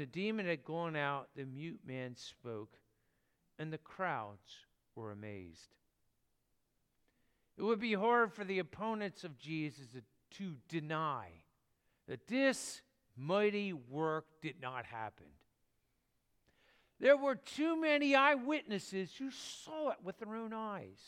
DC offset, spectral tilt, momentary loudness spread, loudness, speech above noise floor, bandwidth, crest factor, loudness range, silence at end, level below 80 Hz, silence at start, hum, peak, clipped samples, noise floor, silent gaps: under 0.1%; -5 dB/octave; 18 LU; -37 LUFS; 43 dB; 15 kHz; 24 dB; 13 LU; 0 s; -80 dBFS; 0 s; none; -16 dBFS; under 0.1%; -81 dBFS; none